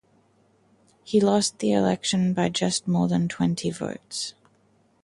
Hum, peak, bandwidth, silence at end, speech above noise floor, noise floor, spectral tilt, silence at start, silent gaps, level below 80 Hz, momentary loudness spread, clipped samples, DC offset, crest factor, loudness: none; -8 dBFS; 11.5 kHz; 0.7 s; 40 dB; -63 dBFS; -5 dB/octave; 1.05 s; none; -60 dBFS; 10 LU; under 0.1%; under 0.1%; 18 dB; -24 LUFS